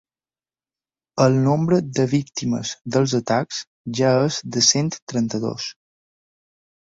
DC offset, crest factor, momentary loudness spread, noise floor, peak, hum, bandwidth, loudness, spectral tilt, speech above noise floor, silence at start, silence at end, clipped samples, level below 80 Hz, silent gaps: under 0.1%; 18 dB; 13 LU; under -90 dBFS; -4 dBFS; none; 7.8 kHz; -20 LUFS; -4.5 dB/octave; over 70 dB; 1.15 s; 1.1 s; under 0.1%; -58 dBFS; 3.67-3.84 s, 5.02-5.07 s